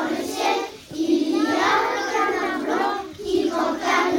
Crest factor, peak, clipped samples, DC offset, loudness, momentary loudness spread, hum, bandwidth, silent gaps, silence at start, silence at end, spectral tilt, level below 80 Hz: 14 dB; -8 dBFS; under 0.1%; under 0.1%; -22 LUFS; 6 LU; none; 17 kHz; none; 0 s; 0 s; -3 dB/octave; -56 dBFS